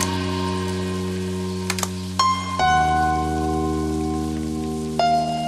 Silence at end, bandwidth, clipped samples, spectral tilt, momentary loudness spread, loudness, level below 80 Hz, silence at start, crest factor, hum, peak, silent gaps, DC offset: 0 s; 15.5 kHz; under 0.1%; -4.5 dB/octave; 7 LU; -22 LUFS; -36 dBFS; 0 s; 18 dB; none; -6 dBFS; none; under 0.1%